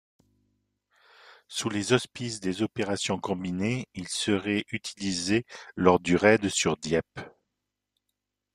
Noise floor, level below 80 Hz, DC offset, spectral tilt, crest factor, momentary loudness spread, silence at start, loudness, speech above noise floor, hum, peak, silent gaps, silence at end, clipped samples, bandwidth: -84 dBFS; -62 dBFS; under 0.1%; -4.5 dB/octave; 24 dB; 13 LU; 1.5 s; -27 LUFS; 57 dB; 50 Hz at -55 dBFS; -6 dBFS; none; 1.25 s; under 0.1%; 14 kHz